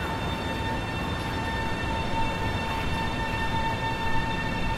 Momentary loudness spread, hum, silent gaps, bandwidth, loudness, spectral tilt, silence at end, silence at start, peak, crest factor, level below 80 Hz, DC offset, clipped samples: 2 LU; none; none; 15.5 kHz; -29 LUFS; -5.5 dB/octave; 0 s; 0 s; -14 dBFS; 14 dB; -36 dBFS; under 0.1%; under 0.1%